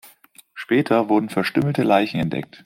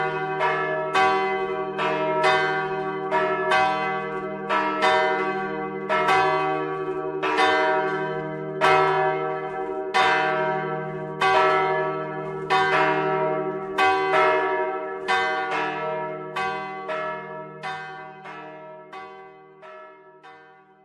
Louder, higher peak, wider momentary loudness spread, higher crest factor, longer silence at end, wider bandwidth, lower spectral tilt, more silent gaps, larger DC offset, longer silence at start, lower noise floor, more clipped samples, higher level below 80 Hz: first, -20 LUFS vs -23 LUFS; about the same, -4 dBFS vs -6 dBFS; second, 8 LU vs 14 LU; about the same, 18 dB vs 18 dB; second, 0.2 s vs 0.4 s; first, 16 kHz vs 12 kHz; first, -7 dB/octave vs -4.5 dB/octave; neither; neither; about the same, 0.05 s vs 0 s; about the same, -51 dBFS vs -51 dBFS; neither; first, -56 dBFS vs -66 dBFS